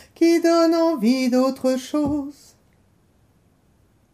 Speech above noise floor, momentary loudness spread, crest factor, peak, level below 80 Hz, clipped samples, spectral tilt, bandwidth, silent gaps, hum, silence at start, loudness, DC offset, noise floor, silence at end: 40 dB; 8 LU; 14 dB; -8 dBFS; -56 dBFS; under 0.1%; -5 dB/octave; 15 kHz; none; none; 0.2 s; -19 LUFS; under 0.1%; -59 dBFS; 1.8 s